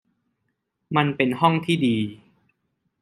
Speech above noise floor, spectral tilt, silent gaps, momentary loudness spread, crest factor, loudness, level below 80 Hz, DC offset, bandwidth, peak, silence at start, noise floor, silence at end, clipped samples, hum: 55 dB; -6.5 dB/octave; none; 6 LU; 22 dB; -22 LUFS; -66 dBFS; under 0.1%; 14.5 kHz; -2 dBFS; 0.9 s; -76 dBFS; 0.85 s; under 0.1%; none